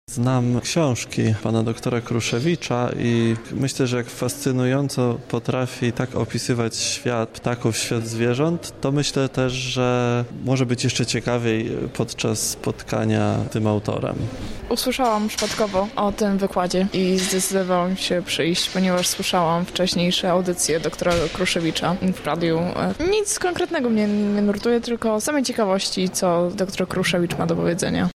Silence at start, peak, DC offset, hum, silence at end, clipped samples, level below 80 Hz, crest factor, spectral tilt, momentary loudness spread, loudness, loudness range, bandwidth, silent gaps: 0.1 s; -8 dBFS; under 0.1%; none; 0.05 s; under 0.1%; -46 dBFS; 14 dB; -4.5 dB/octave; 4 LU; -22 LUFS; 3 LU; 15.5 kHz; none